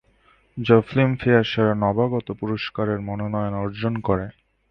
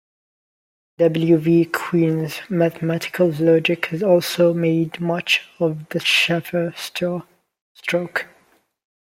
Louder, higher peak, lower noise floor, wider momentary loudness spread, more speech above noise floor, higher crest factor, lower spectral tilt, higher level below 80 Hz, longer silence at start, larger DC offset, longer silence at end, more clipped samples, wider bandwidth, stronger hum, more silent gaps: second, -22 LUFS vs -19 LUFS; about the same, -2 dBFS vs -4 dBFS; about the same, -59 dBFS vs -59 dBFS; about the same, 9 LU vs 9 LU; about the same, 38 dB vs 40 dB; about the same, 20 dB vs 18 dB; first, -9 dB/octave vs -5.5 dB/octave; first, -48 dBFS vs -64 dBFS; second, 0.55 s vs 1 s; neither; second, 0.4 s vs 0.9 s; neither; second, 6.2 kHz vs 16.5 kHz; neither; second, none vs 7.61-7.75 s